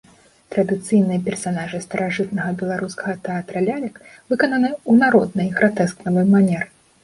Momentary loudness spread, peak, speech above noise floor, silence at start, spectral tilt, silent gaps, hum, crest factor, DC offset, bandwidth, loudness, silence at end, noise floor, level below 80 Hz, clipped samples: 11 LU; -2 dBFS; 21 dB; 0.5 s; -6.5 dB/octave; none; none; 18 dB; under 0.1%; 11.5 kHz; -20 LUFS; 0.4 s; -40 dBFS; -58 dBFS; under 0.1%